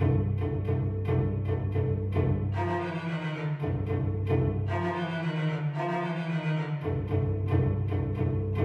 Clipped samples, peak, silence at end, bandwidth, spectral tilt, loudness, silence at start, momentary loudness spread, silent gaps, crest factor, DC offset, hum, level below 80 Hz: under 0.1%; -14 dBFS; 0 s; 5.2 kHz; -9 dB/octave; -30 LUFS; 0 s; 4 LU; none; 14 dB; under 0.1%; none; -44 dBFS